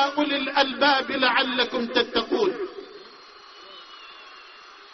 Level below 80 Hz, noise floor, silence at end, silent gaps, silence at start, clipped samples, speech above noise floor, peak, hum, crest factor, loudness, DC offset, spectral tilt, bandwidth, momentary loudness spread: -62 dBFS; -47 dBFS; 0.05 s; none; 0 s; under 0.1%; 24 dB; -4 dBFS; none; 22 dB; -22 LUFS; under 0.1%; 0.5 dB/octave; 6.4 kHz; 23 LU